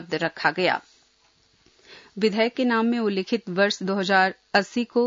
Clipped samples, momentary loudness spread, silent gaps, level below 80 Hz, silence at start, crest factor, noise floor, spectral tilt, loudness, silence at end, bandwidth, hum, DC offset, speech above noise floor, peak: under 0.1%; 6 LU; none; -72 dBFS; 0 s; 18 dB; -62 dBFS; -5 dB/octave; -23 LUFS; 0 s; 7.8 kHz; none; under 0.1%; 39 dB; -6 dBFS